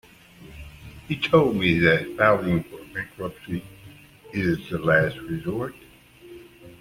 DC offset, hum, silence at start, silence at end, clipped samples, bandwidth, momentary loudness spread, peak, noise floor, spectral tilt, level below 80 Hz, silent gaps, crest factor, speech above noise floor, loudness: under 0.1%; none; 0.4 s; 0.1 s; under 0.1%; 16 kHz; 16 LU; -4 dBFS; -48 dBFS; -7 dB/octave; -50 dBFS; none; 22 dB; 25 dB; -23 LUFS